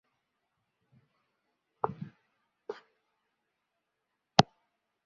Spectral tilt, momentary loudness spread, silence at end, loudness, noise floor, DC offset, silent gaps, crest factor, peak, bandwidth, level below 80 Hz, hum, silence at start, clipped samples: -3.5 dB/octave; 22 LU; 0.65 s; -30 LUFS; -84 dBFS; under 0.1%; none; 36 dB; -2 dBFS; 6.8 kHz; -66 dBFS; none; 1.85 s; under 0.1%